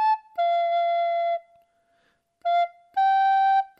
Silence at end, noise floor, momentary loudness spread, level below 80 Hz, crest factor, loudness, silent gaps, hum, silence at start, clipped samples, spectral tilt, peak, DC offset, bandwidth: 0.15 s; -68 dBFS; 8 LU; -86 dBFS; 10 dB; -23 LUFS; none; none; 0 s; under 0.1%; 0 dB/octave; -14 dBFS; under 0.1%; 5.8 kHz